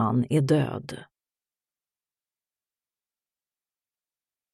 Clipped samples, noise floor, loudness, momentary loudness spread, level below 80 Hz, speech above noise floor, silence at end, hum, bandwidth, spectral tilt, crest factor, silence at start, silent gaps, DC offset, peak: under 0.1%; under -90 dBFS; -24 LUFS; 18 LU; -68 dBFS; over 65 dB; 3.5 s; none; 13 kHz; -7.5 dB/octave; 20 dB; 0 s; none; under 0.1%; -10 dBFS